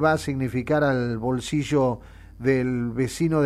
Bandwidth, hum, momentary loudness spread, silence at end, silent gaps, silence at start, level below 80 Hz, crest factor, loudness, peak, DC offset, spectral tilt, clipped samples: 14.5 kHz; none; 5 LU; 0 s; none; 0 s; -46 dBFS; 16 dB; -24 LUFS; -8 dBFS; under 0.1%; -6.5 dB/octave; under 0.1%